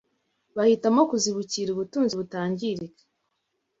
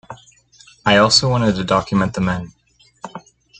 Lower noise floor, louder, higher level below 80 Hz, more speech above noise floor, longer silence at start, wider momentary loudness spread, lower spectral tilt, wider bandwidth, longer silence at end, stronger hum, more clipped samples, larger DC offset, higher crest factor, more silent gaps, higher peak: first, -77 dBFS vs -49 dBFS; second, -25 LUFS vs -16 LUFS; second, -68 dBFS vs -46 dBFS; first, 53 dB vs 33 dB; first, 0.55 s vs 0.1 s; second, 12 LU vs 24 LU; about the same, -4.5 dB/octave vs -4.5 dB/octave; second, 8 kHz vs 9.4 kHz; first, 0.9 s vs 0.4 s; neither; neither; neither; about the same, 18 dB vs 18 dB; neither; second, -8 dBFS vs 0 dBFS